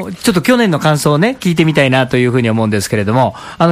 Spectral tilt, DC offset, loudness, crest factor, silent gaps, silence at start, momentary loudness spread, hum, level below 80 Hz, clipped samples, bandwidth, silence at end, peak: -5.5 dB/octave; under 0.1%; -12 LUFS; 12 dB; none; 0 s; 4 LU; none; -44 dBFS; under 0.1%; 15.5 kHz; 0 s; 0 dBFS